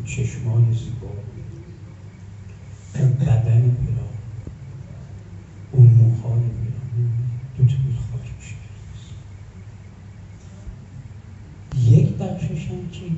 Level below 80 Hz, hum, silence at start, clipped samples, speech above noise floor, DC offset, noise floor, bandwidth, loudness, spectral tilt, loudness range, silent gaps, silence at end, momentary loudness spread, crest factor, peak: -42 dBFS; none; 0 s; under 0.1%; 20 dB; under 0.1%; -39 dBFS; 7.8 kHz; -20 LUFS; -8.5 dB/octave; 13 LU; none; 0 s; 24 LU; 18 dB; -2 dBFS